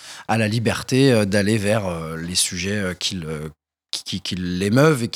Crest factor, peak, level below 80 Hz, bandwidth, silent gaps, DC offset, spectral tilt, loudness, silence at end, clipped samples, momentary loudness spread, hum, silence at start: 20 dB; -2 dBFS; -54 dBFS; 17 kHz; none; under 0.1%; -4.5 dB/octave; -21 LUFS; 0.05 s; under 0.1%; 12 LU; none; 0 s